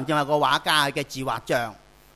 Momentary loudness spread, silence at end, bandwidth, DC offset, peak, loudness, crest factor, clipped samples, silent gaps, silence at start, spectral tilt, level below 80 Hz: 9 LU; 0.4 s; 15.5 kHz; under 0.1%; -6 dBFS; -23 LUFS; 20 dB; under 0.1%; none; 0 s; -3.5 dB/octave; -58 dBFS